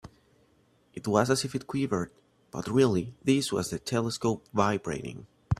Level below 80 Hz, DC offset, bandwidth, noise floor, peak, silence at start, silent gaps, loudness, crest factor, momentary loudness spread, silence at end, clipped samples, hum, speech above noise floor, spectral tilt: -54 dBFS; under 0.1%; 15 kHz; -65 dBFS; -8 dBFS; 0.05 s; none; -29 LUFS; 22 dB; 14 LU; 0.05 s; under 0.1%; none; 37 dB; -5.5 dB/octave